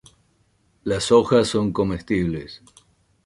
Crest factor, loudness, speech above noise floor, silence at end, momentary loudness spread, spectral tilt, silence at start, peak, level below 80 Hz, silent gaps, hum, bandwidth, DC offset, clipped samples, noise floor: 20 dB; -21 LUFS; 43 dB; 0.7 s; 16 LU; -5.5 dB/octave; 0.85 s; -4 dBFS; -46 dBFS; none; none; 11.5 kHz; under 0.1%; under 0.1%; -63 dBFS